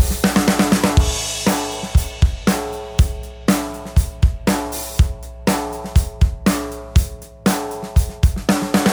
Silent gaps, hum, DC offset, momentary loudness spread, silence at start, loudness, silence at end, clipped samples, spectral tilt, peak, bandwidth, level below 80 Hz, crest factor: none; none; under 0.1%; 7 LU; 0 s; -19 LUFS; 0 s; under 0.1%; -5 dB/octave; -2 dBFS; over 20 kHz; -22 dBFS; 16 dB